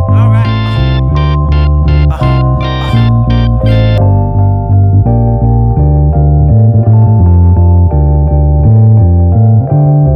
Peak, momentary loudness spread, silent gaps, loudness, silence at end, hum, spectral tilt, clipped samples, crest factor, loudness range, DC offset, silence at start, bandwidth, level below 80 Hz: 0 dBFS; 4 LU; none; -8 LUFS; 0 s; none; -10 dB/octave; 0.5%; 6 dB; 3 LU; under 0.1%; 0 s; 5.6 kHz; -14 dBFS